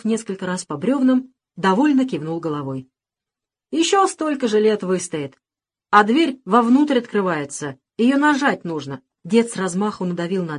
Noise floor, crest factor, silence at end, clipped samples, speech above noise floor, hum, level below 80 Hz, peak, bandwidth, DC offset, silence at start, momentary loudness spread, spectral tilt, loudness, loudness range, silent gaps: -90 dBFS; 18 dB; 0 s; under 0.1%; 71 dB; none; -68 dBFS; -2 dBFS; 11 kHz; under 0.1%; 0.05 s; 13 LU; -5 dB/octave; -19 LUFS; 4 LU; none